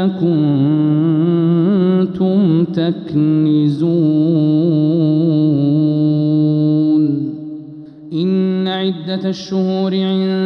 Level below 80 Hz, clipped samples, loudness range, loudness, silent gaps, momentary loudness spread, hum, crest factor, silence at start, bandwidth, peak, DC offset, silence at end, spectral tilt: -58 dBFS; under 0.1%; 4 LU; -15 LUFS; none; 7 LU; none; 10 dB; 0 s; 6.2 kHz; -4 dBFS; under 0.1%; 0 s; -9.5 dB/octave